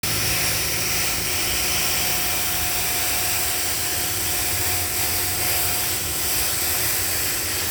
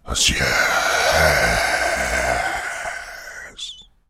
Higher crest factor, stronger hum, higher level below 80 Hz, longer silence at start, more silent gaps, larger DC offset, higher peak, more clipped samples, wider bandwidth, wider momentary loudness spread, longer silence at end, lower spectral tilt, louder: about the same, 16 dB vs 18 dB; neither; second, -42 dBFS vs -34 dBFS; about the same, 0.05 s vs 0.05 s; neither; neither; second, -8 dBFS vs -2 dBFS; neither; first, over 20 kHz vs 17.5 kHz; second, 2 LU vs 17 LU; second, 0 s vs 0.25 s; about the same, -1 dB/octave vs -2 dB/octave; about the same, -19 LUFS vs -18 LUFS